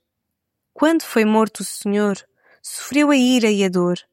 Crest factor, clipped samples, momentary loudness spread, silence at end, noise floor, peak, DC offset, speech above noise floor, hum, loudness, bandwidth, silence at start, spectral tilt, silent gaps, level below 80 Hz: 16 dB; under 0.1%; 15 LU; 0.1 s; -78 dBFS; -4 dBFS; under 0.1%; 60 dB; none; -18 LUFS; 16.5 kHz; 0.75 s; -4.5 dB/octave; none; -70 dBFS